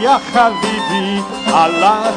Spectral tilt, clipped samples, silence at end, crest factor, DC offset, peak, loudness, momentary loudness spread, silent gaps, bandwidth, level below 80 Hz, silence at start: -4 dB/octave; under 0.1%; 0 s; 12 dB; under 0.1%; 0 dBFS; -14 LUFS; 6 LU; none; 10.5 kHz; -48 dBFS; 0 s